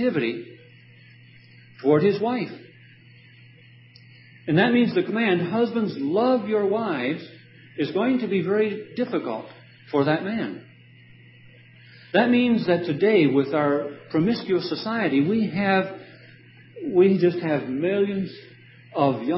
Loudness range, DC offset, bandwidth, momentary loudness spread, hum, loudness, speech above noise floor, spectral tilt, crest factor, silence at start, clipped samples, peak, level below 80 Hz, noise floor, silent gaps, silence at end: 5 LU; under 0.1%; 5.8 kHz; 14 LU; none; -23 LUFS; 28 dB; -11 dB/octave; 18 dB; 0 s; under 0.1%; -6 dBFS; -68 dBFS; -50 dBFS; none; 0 s